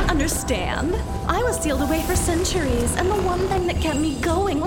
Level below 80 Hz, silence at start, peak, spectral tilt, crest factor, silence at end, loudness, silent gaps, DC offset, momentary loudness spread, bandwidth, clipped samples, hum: -30 dBFS; 0 s; -6 dBFS; -4.5 dB/octave; 16 dB; 0 s; -22 LUFS; none; 0.2%; 3 LU; 18.5 kHz; under 0.1%; none